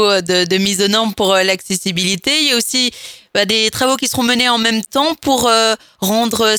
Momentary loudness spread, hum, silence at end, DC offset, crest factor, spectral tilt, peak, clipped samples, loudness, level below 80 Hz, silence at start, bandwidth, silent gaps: 5 LU; none; 0 s; under 0.1%; 14 dB; -2.5 dB/octave; 0 dBFS; under 0.1%; -14 LUFS; -50 dBFS; 0 s; 20 kHz; none